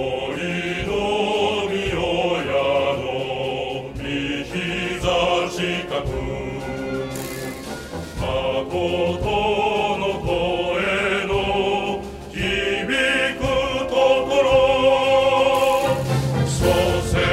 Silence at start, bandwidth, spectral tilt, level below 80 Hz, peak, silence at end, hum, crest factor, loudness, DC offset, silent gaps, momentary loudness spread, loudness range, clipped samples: 0 s; 16 kHz; -5 dB/octave; -38 dBFS; -4 dBFS; 0 s; none; 16 dB; -21 LUFS; under 0.1%; none; 11 LU; 7 LU; under 0.1%